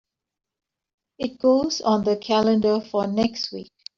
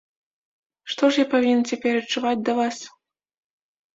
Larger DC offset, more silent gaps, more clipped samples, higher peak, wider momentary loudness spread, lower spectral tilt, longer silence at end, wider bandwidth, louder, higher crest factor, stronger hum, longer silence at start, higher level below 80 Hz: neither; neither; neither; about the same, -6 dBFS vs -6 dBFS; second, 11 LU vs 16 LU; first, -5.5 dB/octave vs -3.5 dB/octave; second, 0.35 s vs 1.05 s; about the same, 7.4 kHz vs 7.8 kHz; about the same, -22 LUFS vs -22 LUFS; about the same, 16 dB vs 18 dB; neither; first, 1.2 s vs 0.85 s; first, -58 dBFS vs -70 dBFS